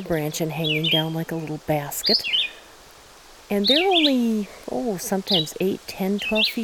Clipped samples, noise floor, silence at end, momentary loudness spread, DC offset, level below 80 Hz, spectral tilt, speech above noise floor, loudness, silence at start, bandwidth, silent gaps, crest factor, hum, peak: under 0.1%; -47 dBFS; 0 s; 10 LU; under 0.1%; -54 dBFS; -4 dB/octave; 25 dB; -22 LUFS; 0 s; 19 kHz; none; 16 dB; none; -8 dBFS